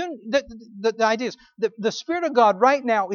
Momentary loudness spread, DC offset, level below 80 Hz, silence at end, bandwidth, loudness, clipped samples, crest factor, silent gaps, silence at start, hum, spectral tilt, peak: 11 LU; under 0.1%; -62 dBFS; 0 s; 7.2 kHz; -22 LUFS; under 0.1%; 18 dB; none; 0 s; none; -4 dB/octave; -4 dBFS